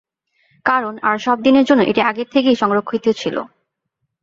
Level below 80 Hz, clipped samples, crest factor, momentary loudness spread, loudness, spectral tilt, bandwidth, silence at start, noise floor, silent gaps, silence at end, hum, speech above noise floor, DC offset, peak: -58 dBFS; under 0.1%; 16 dB; 9 LU; -16 LUFS; -5.5 dB/octave; 7.6 kHz; 0.65 s; -74 dBFS; none; 0.75 s; none; 59 dB; under 0.1%; 0 dBFS